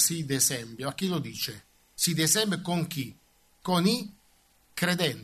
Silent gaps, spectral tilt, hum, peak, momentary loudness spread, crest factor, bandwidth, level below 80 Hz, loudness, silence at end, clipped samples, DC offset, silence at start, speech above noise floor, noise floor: none; -3 dB/octave; none; -10 dBFS; 17 LU; 18 dB; 14 kHz; -66 dBFS; -27 LUFS; 0 s; under 0.1%; under 0.1%; 0 s; 36 dB; -64 dBFS